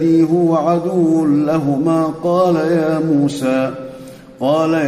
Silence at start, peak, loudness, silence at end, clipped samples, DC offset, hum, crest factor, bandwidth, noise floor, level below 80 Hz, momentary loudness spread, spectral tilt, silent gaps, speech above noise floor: 0 s; -4 dBFS; -15 LUFS; 0 s; under 0.1%; under 0.1%; none; 12 dB; 13 kHz; -35 dBFS; -54 dBFS; 7 LU; -7.5 dB/octave; none; 21 dB